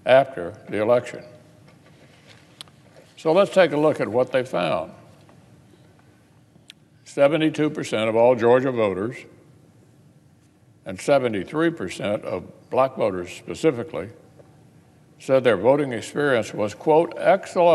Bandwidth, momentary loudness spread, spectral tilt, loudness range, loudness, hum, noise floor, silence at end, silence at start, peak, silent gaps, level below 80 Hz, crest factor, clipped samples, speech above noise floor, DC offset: 12.5 kHz; 16 LU; -6 dB/octave; 5 LU; -21 LUFS; none; -55 dBFS; 0 s; 0.05 s; -4 dBFS; none; -66 dBFS; 20 dB; under 0.1%; 35 dB; under 0.1%